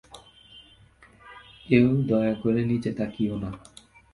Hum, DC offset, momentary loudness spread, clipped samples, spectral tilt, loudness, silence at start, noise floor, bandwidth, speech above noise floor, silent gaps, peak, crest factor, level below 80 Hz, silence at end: none; under 0.1%; 24 LU; under 0.1%; -8.5 dB/octave; -25 LUFS; 0.15 s; -55 dBFS; 11.5 kHz; 31 dB; none; -4 dBFS; 22 dB; -54 dBFS; 0.55 s